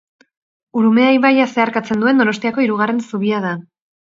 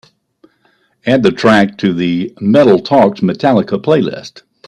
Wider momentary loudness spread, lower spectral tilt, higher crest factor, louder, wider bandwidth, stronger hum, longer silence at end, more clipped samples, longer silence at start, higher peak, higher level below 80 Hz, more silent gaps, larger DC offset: about the same, 9 LU vs 8 LU; about the same, -6 dB/octave vs -7 dB/octave; about the same, 16 dB vs 12 dB; second, -15 LUFS vs -12 LUFS; second, 7.6 kHz vs 10.5 kHz; neither; first, 0.55 s vs 0.4 s; neither; second, 0.75 s vs 1.05 s; about the same, 0 dBFS vs 0 dBFS; second, -64 dBFS vs -52 dBFS; neither; neither